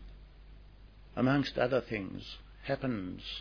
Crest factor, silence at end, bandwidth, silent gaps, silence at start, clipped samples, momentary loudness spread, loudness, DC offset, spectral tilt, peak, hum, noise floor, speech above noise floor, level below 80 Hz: 20 dB; 0 s; 5.4 kHz; none; 0 s; under 0.1%; 15 LU; -34 LUFS; under 0.1%; -7.5 dB/octave; -14 dBFS; none; -54 dBFS; 21 dB; -54 dBFS